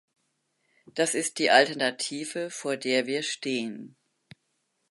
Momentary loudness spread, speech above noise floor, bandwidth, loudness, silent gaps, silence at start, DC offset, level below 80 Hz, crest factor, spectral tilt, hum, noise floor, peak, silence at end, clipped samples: 13 LU; 49 dB; 12 kHz; -26 LUFS; none; 0.95 s; under 0.1%; -82 dBFS; 26 dB; -2 dB/octave; none; -76 dBFS; -4 dBFS; 1.05 s; under 0.1%